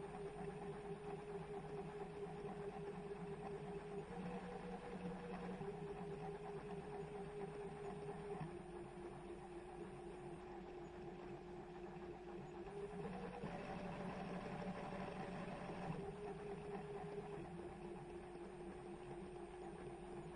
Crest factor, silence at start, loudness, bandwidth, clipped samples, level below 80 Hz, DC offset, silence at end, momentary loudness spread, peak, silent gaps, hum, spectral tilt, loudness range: 16 dB; 0 s; -51 LUFS; 10.5 kHz; under 0.1%; -66 dBFS; under 0.1%; 0 s; 5 LU; -34 dBFS; none; none; -7 dB/octave; 4 LU